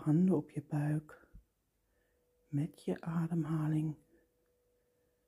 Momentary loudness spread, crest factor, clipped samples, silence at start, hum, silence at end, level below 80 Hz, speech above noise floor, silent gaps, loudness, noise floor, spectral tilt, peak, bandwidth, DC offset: 10 LU; 16 dB; under 0.1%; 0 s; none; 1.3 s; -70 dBFS; 45 dB; none; -36 LUFS; -79 dBFS; -9.5 dB/octave; -20 dBFS; 12 kHz; under 0.1%